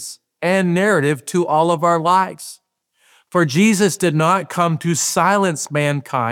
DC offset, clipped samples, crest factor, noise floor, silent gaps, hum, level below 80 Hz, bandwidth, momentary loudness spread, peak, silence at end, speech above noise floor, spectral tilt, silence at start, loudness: under 0.1%; under 0.1%; 16 dB; -61 dBFS; none; none; -68 dBFS; 19 kHz; 7 LU; -2 dBFS; 0 s; 45 dB; -5 dB/octave; 0 s; -17 LUFS